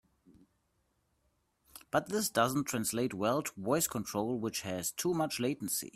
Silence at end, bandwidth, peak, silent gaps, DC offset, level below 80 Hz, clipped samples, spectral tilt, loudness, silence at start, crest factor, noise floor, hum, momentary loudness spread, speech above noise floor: 0.05 s; 16 kHz; -14 dBFS; none; under 0.1%; -68 dBFS; under 0.1%; -4 dB/octave; -33 LUFS; 0.3 s; 22 dB; -77 dBFS; none; 5 LU; 44 dB